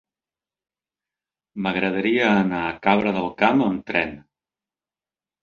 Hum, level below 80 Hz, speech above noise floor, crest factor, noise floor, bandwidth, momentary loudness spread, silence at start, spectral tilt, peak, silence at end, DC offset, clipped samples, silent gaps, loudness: none; -56 dBFS; over 69 dB; 22 dB; under -90 dBFS; 6.8 kHz; 8 LU; 1.55 s; -7 dB/octave; -2 dBFS; 1.25 s; under 0.1%; under 0.1%; none; -21 LUFS